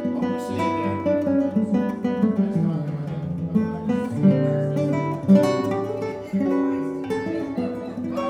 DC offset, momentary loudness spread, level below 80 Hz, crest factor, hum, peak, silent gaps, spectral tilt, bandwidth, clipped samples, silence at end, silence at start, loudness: under 0.1%; 9 LU; -56 dBFS; 18 dB; none; -4 dBFS; none; -8.5 dB/octave; 11.5 kHz; under 0.1%; 0 s; 0 s; -23 LUFS